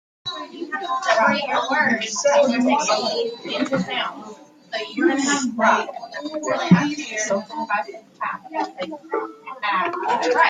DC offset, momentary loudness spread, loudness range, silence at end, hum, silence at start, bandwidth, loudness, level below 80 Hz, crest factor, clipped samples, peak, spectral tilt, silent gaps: under 0.1%; 13 LU; 4 LU; 0 s; none; 0.25 s; 9.6 kHz; -21 LUFS; -68 dBFS; 20 dB; under 0.1%; -2 dBFS; -4 dB/octave; none